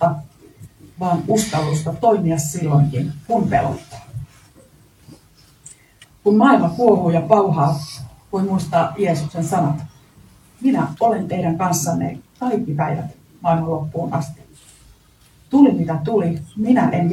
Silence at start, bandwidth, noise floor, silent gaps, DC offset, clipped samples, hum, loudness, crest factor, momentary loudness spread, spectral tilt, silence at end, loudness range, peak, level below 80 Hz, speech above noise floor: 0 s; 15 kHz; -51 dBFS; none; under 0.1%; under 0.1%; none; -18 LUFS; 20 dB; 13 LU; -7 dB/octave; 0 s; 6 LU; 0 dBFS; -50 dBFS; 34 dB